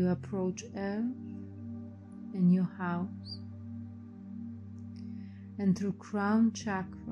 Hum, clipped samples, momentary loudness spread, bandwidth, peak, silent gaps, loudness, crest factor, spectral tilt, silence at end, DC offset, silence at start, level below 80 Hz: none; under 0.1%; 18 LU; 8 kHz; -18 dBFS; none; -34 LUFS; 16 dB; -7 dB/octave; 0 s; under 0.1%; 0 s; -70 dBFS